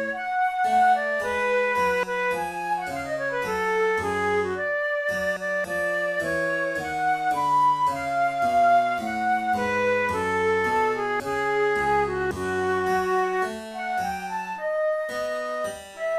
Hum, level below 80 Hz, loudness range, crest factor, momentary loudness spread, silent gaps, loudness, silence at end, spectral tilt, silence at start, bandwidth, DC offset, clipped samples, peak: none; -54 dBFS; 3 LU; 14 dB; 8 LU; none; -24 LUFS; 0 s; -4.5 dB/octave; 0 s; 15.5 kHz; under 0.1%; under 0.1%; -12 dBFS